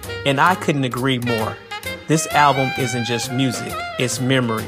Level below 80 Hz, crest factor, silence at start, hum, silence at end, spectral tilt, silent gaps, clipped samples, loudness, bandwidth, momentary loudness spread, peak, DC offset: -52 dBFS; 18 dB; 0 s; none; 0 s; -4.5 dB/octave; none; under 0.1%; -19 LUFS; 15.5 kHz; 10 LU; -2 dBFS; under 0.1%